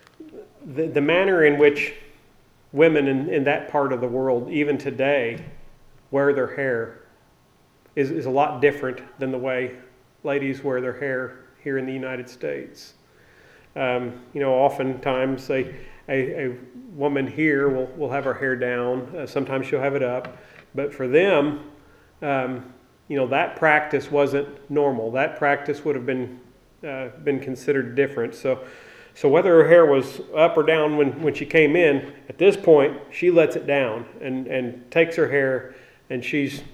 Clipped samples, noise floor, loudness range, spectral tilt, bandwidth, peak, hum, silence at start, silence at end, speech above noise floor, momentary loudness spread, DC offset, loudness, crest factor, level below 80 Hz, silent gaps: under 0.1%; -58 dBFS; 8 LU; -6.5 dB/octave; 13 kHz; -2 dBFS; none; 0.2 s; 0.05 s; 36 dB; 14 LU; under 0.1%; -22 LUFS; 20 dB; -58 dBFS; none